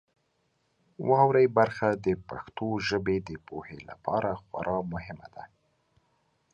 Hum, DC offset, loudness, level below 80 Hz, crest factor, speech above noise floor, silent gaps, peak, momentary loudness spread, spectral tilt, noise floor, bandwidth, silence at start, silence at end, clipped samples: none; under 0.1%; -28 LUFS; -56 dBFS; 22 dB; 46 dB; none; -8 dBFS; 20 LU; -7 dB/octave; -74 dBFS; 7.2 kHz; 1 s; 1.1 s; under 0.1%